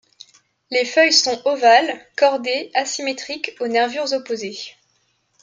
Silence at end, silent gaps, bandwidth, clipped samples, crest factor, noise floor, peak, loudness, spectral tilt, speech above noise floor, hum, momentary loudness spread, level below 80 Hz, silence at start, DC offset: 0.7 s; none; 9.6 kHz; under 0.1%; 18 dB; -65 dBFS; -2 dBFS; -18 LUFS; -1 dB/octave; 47 dB; none; 13 LU; -72 dBFS; 0.7 s; under 0.1%